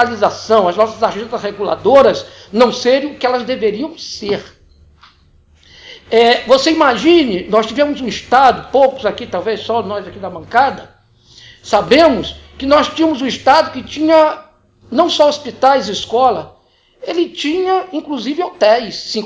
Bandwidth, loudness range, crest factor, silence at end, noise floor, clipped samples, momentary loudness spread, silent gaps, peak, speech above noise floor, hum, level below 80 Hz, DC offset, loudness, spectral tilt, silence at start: 8 kHz; 5 LU; 14 dB; 0 s; -49 dBFS; under 0.1%; 12 LU; none; 0 dBFS; 36 dB; none; -46 dBFS; under 0.1%; -14 LUFS; -4 dB/octave; 0 s